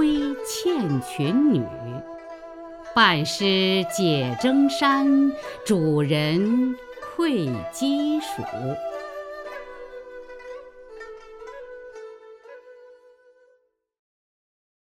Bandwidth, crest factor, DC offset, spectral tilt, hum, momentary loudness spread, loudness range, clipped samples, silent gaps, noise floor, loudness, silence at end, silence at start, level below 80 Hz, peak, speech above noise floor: 16 kHz; 22 dB; under 0.1%; -5 dB/octave; none; 21 LU; 21 LU; under 0.1%; none; -65 dBFS; -22 LUFS; 1.95 s; 0 s; -56 dBFS; -4 dBFS; 43 dB